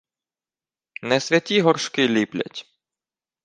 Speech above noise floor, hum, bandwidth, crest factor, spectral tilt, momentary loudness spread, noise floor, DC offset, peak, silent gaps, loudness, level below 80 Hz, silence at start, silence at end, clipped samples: over 69 dB; none; 9.8 kHz; 22 dB; -4.5 dB/octave; 16 LU; under -90 dBFS; under 0.1%; -2 dBFS; none; -21 LUFS; -70 dBFS; 1 s; 0.85 s; under 0.1%